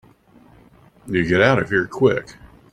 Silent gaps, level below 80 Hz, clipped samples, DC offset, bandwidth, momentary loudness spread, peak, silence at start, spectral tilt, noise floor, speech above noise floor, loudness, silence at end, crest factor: none; -50 dBFS; under 0.1%; under 0.1%; 10.5 kHz; 8 LU; -2 dBFS; 1.05 s; -6.5 dB/octave; -51 dBFS; 33 dB; -18 LUFS; 0.4 s; 18 dB